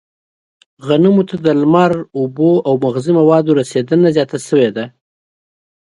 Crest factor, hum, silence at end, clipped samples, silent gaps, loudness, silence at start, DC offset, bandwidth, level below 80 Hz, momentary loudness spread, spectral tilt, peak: 14 dB; none; 1.1 s; under 0.1%; none; -13 LUFS; 0.85 s; under 0.1%; 11.5 kHz; -60 dBFS; 7 LU; -7.5 dB/octave; 0 dBFS